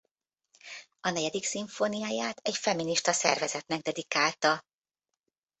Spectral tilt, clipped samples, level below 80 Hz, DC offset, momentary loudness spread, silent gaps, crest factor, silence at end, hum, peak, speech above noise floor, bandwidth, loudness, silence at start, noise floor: -2 dB/octave; under 0.1%; -76 dBFS; under 0.1%; 8 LU; none; 26 dB; 1 s; none; -4 dBFS; 59 dB; 8.4 kHz; -29 LUFS; 0.65 s; -89 dBFS